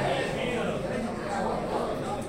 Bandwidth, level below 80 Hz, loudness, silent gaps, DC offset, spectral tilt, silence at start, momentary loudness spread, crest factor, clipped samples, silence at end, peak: 16.5 kHz; -48 dBFS; -30 LUFS; none; under 0.1%; -5.5 dB/octave; 0 s; 3 LU; 14 dB; under 0.1%; 0 s; -16 dBFS